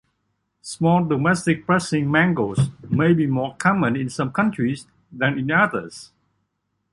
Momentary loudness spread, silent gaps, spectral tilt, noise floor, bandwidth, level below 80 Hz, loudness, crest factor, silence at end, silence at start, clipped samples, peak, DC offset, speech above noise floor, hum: 9 LU; none; -6.5 dB/octave; -74 dBFS; 11.5 kHz; -54 dBFS; -20 LUFS; 18 dB; 0.85 s; 0.65 s; under 0.1%; -2 dBFS; under 0.1%; 54 dB; none